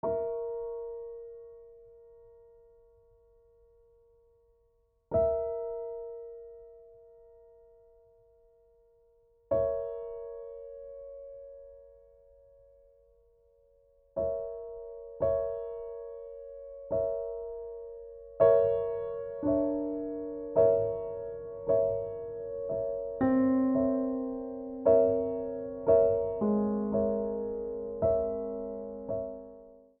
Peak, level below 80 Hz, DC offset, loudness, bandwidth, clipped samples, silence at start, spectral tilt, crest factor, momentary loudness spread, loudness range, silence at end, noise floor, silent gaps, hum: -12 dBFS; -58 dBFS; under 0.1%; -31 LUFS; 3.6 kHz; under 0.1%; 0.05 s; -10 dB/octave; 20 dB; 20 LU; 16 LU; 0.25 s; -70 dBFS; none; none